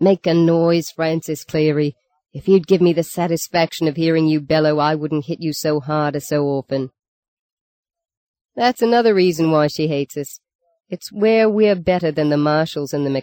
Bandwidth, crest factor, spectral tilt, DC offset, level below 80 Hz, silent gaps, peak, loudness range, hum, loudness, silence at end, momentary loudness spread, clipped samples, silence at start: 17 kHz; 14 dB; -6 dB/octave; under 0.1%; -56 dBFS; 7.08-7.83 s, 8.17-8.34 s, 8.45-8.49 s, 10.55-10.59 s; -2 dBFS; 5 LU; none; -18 LUFS; 0 s; 10 LU; under 0.1%; 0 s